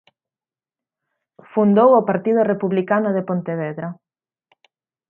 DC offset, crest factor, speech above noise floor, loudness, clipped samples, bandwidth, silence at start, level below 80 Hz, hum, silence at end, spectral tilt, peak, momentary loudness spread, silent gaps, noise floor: under 0.1%; 18 dB; over 73 dB; -18 LUFS; under 0.1%; 3.4 kHz; 1.55 s; -72 dBFS; none; 1.15 s; -11 dB/octave; -2 dBFS; 13 LU; none; under -90 dBFS